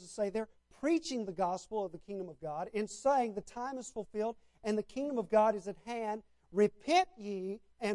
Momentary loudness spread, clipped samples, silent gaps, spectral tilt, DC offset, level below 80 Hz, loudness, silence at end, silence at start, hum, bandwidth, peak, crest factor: 12 LU; under 0.1%; none; -5 dB/octave; under 0.1%; -68 dBFS; -35 LUFS; 0 s; 0 s; none; 11.5 kHz; -16 dBFS; 18 dB